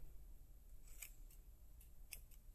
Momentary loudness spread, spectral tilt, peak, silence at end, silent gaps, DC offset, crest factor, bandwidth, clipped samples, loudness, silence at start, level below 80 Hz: 9 LU; -2 dB/octave; -32 dBFS; 0 s; none; under 0.1%; 24 dB; 16 kHz; under 0.1%; -61 LUFS; 0 s; -60 dBFS